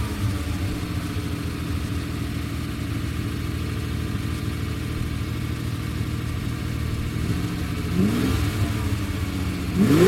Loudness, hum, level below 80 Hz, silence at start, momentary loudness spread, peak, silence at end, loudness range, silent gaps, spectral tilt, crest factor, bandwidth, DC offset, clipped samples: -27 LUFS; none; -34 dBFS; 0 s; 6 LU; -6 dBFS; 0 s; 3 LU; none; -6.5 dB/octave; 20 dB; 16.5 kHz; under 0.1%; under 0.1%